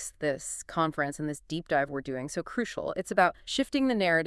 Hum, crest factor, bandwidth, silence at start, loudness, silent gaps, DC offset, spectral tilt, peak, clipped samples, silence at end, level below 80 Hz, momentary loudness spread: none; 20 dB; 12 kHz; 0 s; -30 LUFS; none; under 0.1%; -4 dB/octave; -10 dBFS; under 0.1%; 0 s; -58 dBFS; 9 LU